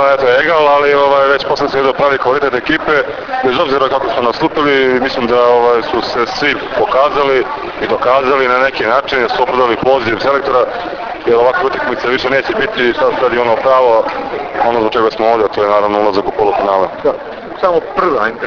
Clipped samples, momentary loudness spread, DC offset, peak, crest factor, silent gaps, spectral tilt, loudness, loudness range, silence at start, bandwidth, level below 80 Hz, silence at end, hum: under 0.1%; 6 LU; under 0.1%; 0 dBFS; 12 dB; none; -5.5 dB/octave; -12 LUFS; 1 LU; 0 s; 5.4 kHz; -42 dBFS; 0 s; none